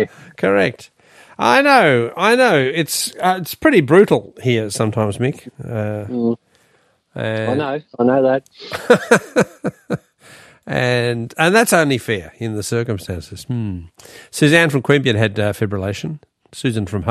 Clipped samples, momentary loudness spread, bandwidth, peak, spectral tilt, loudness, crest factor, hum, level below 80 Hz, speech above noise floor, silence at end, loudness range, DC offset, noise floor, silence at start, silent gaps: under 0.1%; 15 LU; 14.5 kHz; 0 dBFS; -5 dB/octave; -17 LUFS; 18 dB; none; -54 dBFS; 42 dB; 0 s; 6 LU; under 0.1%; -58 dBFS; 0 s; none